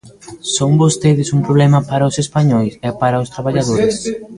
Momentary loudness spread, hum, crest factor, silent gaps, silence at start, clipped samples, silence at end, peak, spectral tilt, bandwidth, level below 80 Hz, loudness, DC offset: 7 LU; none; 14 dB; none; 0.05 s; under 0.1%; 0 s; 0 dBFS; -6 dB/octave; 11.5 kHz; -46 dBFS; -14 LUFS; under 0.1%